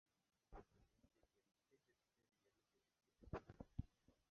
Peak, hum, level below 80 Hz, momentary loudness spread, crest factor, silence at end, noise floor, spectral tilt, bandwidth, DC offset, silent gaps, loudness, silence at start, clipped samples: -32 dBFS; none; -68 dBFS; 10 LU; 30 dB; 0.2 s; -88 dBFS; -7.5 dB/octave; 6.6 kHz; under 0.1%; none; -59 LUFS; 0.5 s; under 0.1%